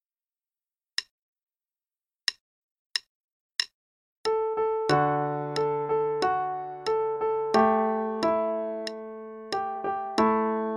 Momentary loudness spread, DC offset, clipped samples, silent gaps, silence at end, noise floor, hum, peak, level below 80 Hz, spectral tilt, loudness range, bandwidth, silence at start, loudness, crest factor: 10 LU; under 0.1%; under 0.1%; 1.11-1.36 s, 1.42-1.47 s, 2.41-2.90 s, 3.09-3.50 s, 3.74-4.24 s; 0 s; under -90 dBFS; none; -8 dBFS; -66 dBFS; -5 dB/octave; 10 LU; 12.5 kHz; 1 s; -28 LUFS; 20 dB